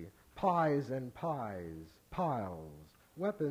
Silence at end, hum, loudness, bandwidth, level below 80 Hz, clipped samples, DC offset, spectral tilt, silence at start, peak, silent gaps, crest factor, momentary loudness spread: 0 s; none; -37 LUFS; 16 kHz; -64 dBFS; under 0.1%; under 0.1%; -8 dB/octave; 0 s; -18 dBFS; none; 18 dB; 20 LU